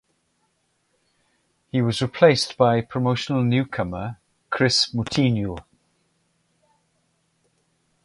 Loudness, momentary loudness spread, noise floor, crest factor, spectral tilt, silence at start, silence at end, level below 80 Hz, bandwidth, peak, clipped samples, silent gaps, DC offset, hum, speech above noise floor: -21 LUFS; 13 LU; -70 dBFS; 22 dB; -5.5 dB/octave; 1.75 s; 2.45 s; -52 dBFS; 11.5 kHz; -2 dBFS; under 0.1%; none; under 0.1%; none; 49 dB